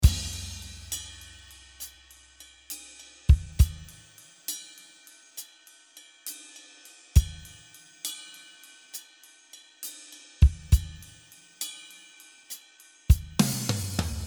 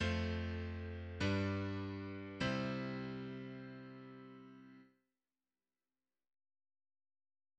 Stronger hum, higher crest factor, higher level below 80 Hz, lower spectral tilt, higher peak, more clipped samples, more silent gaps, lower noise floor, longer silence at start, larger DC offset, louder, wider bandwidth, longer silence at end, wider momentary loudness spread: neither; about the same, 24 dB vs 20 dB; first, -32 dBFS vs -60 dBFS; second, -4.5 dB/octave vs -6.5 dB/octave; first, -6 dBFS vs -24 dBFS; neither; neither; second, -56 dBFS vs under -90 dBFS; about the same, 0 s vs 0 s; neither; first, -29 LUFS vs -42 LUFS; first, over 20 kHz vs 8.4 kHz; second, 0 s vs 2.7 s; first, 25 LU vs 18 LU